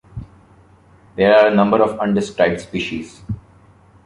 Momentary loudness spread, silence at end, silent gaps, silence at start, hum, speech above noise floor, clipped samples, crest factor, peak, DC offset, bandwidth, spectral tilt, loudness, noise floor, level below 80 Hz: 20 LU; 0.65 s; none; 0.15 s; none; 33 dB; under 0.1%; 18 dB; -2 dBFS; under 0.1%; 11 kHz; -6.5 dB/octave; -16 LUFS; -49 dBFS; -46 dBFS